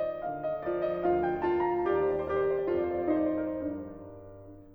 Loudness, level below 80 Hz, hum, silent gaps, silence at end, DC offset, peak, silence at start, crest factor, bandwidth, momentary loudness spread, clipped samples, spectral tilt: -30 LUFS; -56 dBFS; none; none; 0 s; under 0.1%; -16 dBFS; 0 s; 14 dB; 4.8 kHz; 17 LU; under 0.1%; -9.5 dB/octave